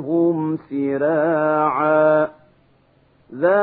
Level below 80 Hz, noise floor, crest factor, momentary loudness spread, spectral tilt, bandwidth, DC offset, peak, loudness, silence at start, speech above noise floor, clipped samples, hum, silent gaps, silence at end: -68 dBFS; -57 dBFS; 16 dB; 8 LU; -12.5 dB/octave; 4.1 kHz; under 0.1%; -4 dBFS; -19 LUFS; 0 s; 39 dB; under 0.1%; none; none; 0 s